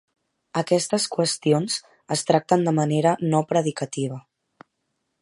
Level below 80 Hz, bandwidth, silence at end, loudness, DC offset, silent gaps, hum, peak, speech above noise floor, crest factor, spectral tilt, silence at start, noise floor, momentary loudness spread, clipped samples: -70 dBFS; 11.5 kHz; 1 s; -23 LUFS; under 0.1%; none; none; -4 dBFS; 54 dB; 20 dB; -5 dB/octave; 0.55 s; -76 dBFS; 9 LU; under 0.1%